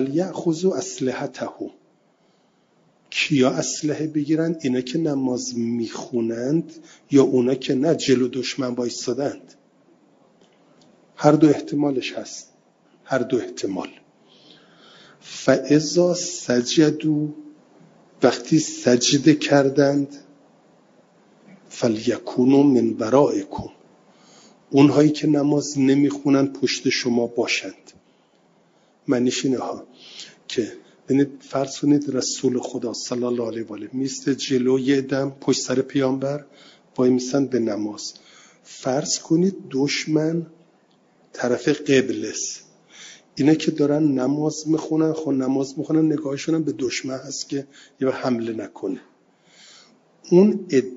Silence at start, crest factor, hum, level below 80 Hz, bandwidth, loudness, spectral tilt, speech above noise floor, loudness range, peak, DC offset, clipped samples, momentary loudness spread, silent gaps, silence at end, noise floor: 0 s; 22 dB; none; -66 dBFS; 7.8 kHz; -21 LUFS; -5 dB/octave; 40 dB; 6 LU; 0 dBFS; under 0.1%; under 0.1%; 14 LU; none; 0 s; -61 dBFS